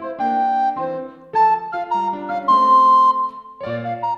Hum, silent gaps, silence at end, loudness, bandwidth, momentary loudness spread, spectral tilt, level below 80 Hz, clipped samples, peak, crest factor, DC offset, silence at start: none; none; 0 s; -17 LUFS; 7 kHz; 15 LU; -6 dB/octave; -64 dBFS; under 0.1%; -6 dBFS; 12 dB; under 0.1%; 0 s